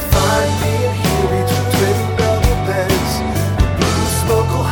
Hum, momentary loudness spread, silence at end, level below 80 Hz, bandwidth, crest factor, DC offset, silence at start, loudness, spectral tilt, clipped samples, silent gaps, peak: none; 2 LU; 0 s; -24 dBFS; 18 kHz; 14 dB; under 0.1%; 0 s; -16 LUFS; -5 dB/octave; under 0.1%; none; 0 dBFS